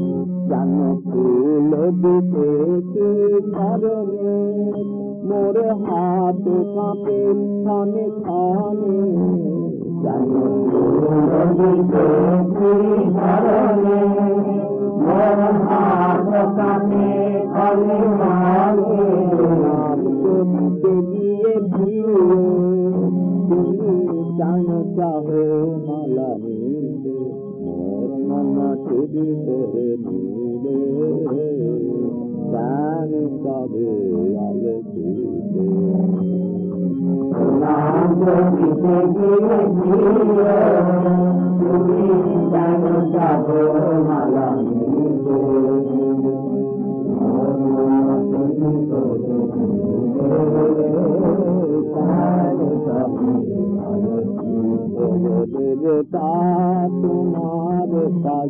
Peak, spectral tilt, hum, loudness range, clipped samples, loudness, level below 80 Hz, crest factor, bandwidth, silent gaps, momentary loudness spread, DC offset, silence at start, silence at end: -6 dBFS; -13.5 dB/octave; none; 6 LU; under 0.1%; -18 LUFS; -56 dBFS; 12 dB; 3.3 kHz; none; 7 LU; under 0.1%; 0 s; 0 s